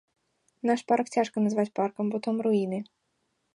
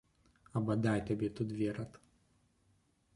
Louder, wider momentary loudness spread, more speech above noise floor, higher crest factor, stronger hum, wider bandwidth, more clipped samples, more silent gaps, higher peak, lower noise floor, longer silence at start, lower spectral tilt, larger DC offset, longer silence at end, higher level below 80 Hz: first, -28 LUFS vs -36 LUFS; second, 7 LU vs 10 LU; first, 49 dB vs 38 dB; about the same, 18 dB vs 20 dB; neither; about the same, 11 kHz vs 11.5 kHz; neither; neither; first, -12 dBFS vs -18 dBFS; about the same, -76 dBFS vs -73 dBFS; about the same, 0.65 s vs 0.55 s; second, -6.5 dB/octave vs -8 dB/octave; neither; second, 0.75 s vs 1.2 s; second, -78 dBFS vs -64 dBFS